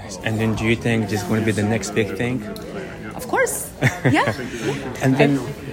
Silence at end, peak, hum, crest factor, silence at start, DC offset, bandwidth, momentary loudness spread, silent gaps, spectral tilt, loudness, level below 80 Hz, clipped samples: 0 s; -2 dBFS; none; 18 dB; 0 s; under 0.1%; 16.5 kHz; 12 LU; none; -5.5 dB/octave; -21 LUFS; -44 dBFS; under 0.1%